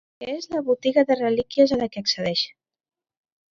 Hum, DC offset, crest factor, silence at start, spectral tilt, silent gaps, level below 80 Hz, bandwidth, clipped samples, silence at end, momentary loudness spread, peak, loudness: none; under 0.1%; 18 dB; 0.2 s; -4.5 dB/octave; none; -60 dBFS; 7.4 kHz; under 0.1%; 1.05 s; 10 LU; -6 dBFS; -22 LUFS